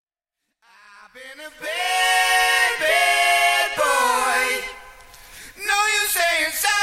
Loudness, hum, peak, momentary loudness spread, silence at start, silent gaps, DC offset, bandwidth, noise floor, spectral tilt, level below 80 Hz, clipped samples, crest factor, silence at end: -18 LUFS; none; -6 dBFS; 13 LU; 1.15 s; none; under 0.1%; 16.5 kHz; -80 dBFS; 1.5 dB/octave; -54 dBFS; under 0.1%; 16 dB; 0 s